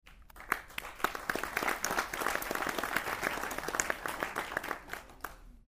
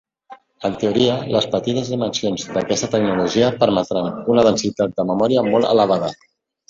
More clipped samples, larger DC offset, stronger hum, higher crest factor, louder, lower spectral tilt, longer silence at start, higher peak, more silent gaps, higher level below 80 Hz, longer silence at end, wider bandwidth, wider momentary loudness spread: neither; neither; neither; first, 30 dB vs 16 dB; second, -35 LUFS vs -18 LUFS; second, -2 dB/octave vs -5 dB/octave; second, 0.05 s vs 0.3 s; second, -8 dBFS vs -2 dBFS; neither; about the same, -56 dBFS vs -54 dBFS; second, 0.1 s vs 0.55 s; first, 16 kHz vs 7.8 kHz; first, 10 LU vs 7 LU